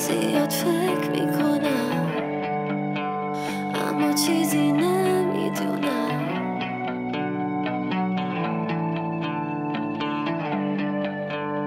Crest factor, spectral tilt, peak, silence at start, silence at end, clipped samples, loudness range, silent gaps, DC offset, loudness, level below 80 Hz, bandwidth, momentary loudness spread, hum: 16 dB; -5.5 dB/octave; -8 dBFS; 0 s; 0 s; under 0.1%; 4 LU; none; under 0.1%; -25 LUFS; -66 dBFS; 16 kHz; 7 LU; none